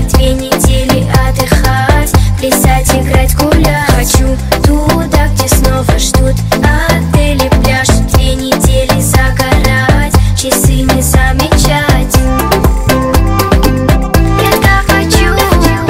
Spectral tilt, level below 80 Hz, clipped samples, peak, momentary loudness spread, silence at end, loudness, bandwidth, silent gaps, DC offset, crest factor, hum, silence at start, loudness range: -5 dB/octave; -12 dBFS; 0.5%; 0 dBFS; 2 LU; 0 s; -9 LUFS; 16.5 kHz; none; under 0.1%; 8 dB; none; 0 s; 1 LU